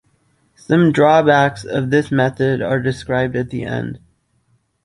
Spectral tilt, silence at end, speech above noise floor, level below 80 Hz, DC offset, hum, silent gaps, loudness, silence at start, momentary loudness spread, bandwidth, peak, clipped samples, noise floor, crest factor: -7 dB/octave; 0.9 s; 46 dB; -48 dBFS; under 0.1%; none; none; -16 LUFS; 0.7 s; 12 LU; 11.5 kHz; -2 dBFS; under 0.1%; -62 dBFS; 16 dB